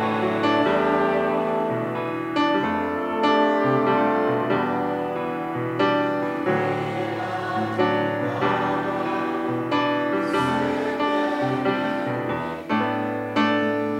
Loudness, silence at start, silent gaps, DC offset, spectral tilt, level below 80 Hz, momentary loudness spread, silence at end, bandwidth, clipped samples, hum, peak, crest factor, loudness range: -23 LUFS; 0 s; none; under 0.1%; -6.5 dB/octave; -60 dBFS; 6 LU; 0 s; 15.5 kHz; under 0.1%; none; -6 dBFS; 16 dB; 2 LU